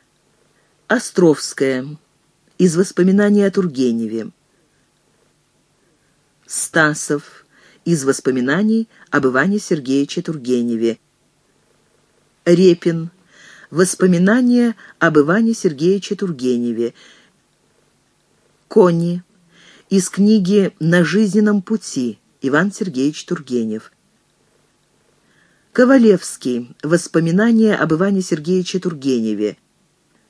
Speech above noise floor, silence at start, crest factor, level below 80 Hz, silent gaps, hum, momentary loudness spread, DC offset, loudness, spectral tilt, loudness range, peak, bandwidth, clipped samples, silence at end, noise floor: 45 dB; 0.9 s; 18 dB; -66 dBFS; none; none; 11 LU; under 0.1%; -16 LUFS; -6 dB/octave; 7 LU; 0 dBFS; 11 kHz; under 0.1%; 0.75 s; -60 dBFS